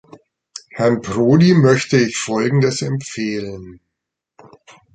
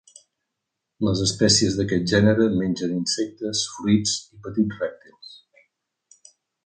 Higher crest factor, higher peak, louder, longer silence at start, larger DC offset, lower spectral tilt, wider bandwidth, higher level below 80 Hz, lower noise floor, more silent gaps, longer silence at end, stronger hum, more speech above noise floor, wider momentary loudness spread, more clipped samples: about the same, 16 dB vs 20 dB; about the same, -2 dBFS vs -4 dBFS; first, -16 LUFS vs -22 LUFS; second, 0.55 s vs 1 s; neither; first, -6 dB/octave vs -4 dB/octave; about the same, 9.4 kHz vs 9.4 kHz; about the same, -52 dBFS vs -50 dBFS; about the same, -80 dBFS vs -82 dBFS; neither; about the same, 1.2 s vs 1.3 s; neither; first, 64 dB vs 60 dB; first, 21 LU vs 11 LU; neither